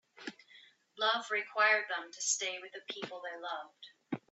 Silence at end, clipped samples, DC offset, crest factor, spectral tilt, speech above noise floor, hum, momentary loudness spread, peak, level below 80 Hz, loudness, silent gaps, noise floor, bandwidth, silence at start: 0.15 s; under 0.1%; under 0.1%; 22 dB; -0.5 dB/octave; 26 dB; none; 18 LU; -16 dBFS; -86 dBFS; -34 LUFS; none; -62 dBFS; 8.2 kHz; 0.15 s